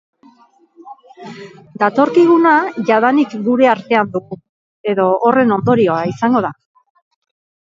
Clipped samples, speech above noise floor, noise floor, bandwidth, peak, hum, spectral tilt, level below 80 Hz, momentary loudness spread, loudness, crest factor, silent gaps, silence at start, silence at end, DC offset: under 0.1%; 37 dB; -50 dBFS; 7.6 kHz; 0 dBFS; none; -7.5 dB/octave; -60 dBFS; 22 LU; -14 LUFS; 16 dB; 4.49-4.84 s; 0.85 s; 1.25 s; under 0.1%